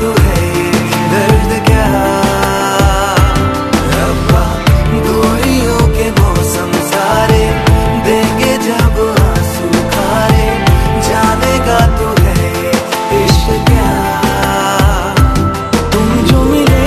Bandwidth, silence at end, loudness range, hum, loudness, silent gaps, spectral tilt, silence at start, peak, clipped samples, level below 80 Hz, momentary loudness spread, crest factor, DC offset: 14 kHz; 0 s; 0 LU; none; -11 LUFS; none; -5.5 dB/octave; 0 s; 0 dBFS; 0.2%; -16 dBFS; 3 LU; 10 dB; under 0.1%